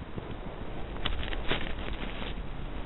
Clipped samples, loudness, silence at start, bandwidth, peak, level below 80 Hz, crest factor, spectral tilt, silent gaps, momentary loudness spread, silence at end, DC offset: under 0.1%; -37 LUFS; 0 s; 4.2 kHz; -10 dBFS; -38 dBFS; 22 dB; -8 dB/octave; none; 8 LU; 0 s; 0.6%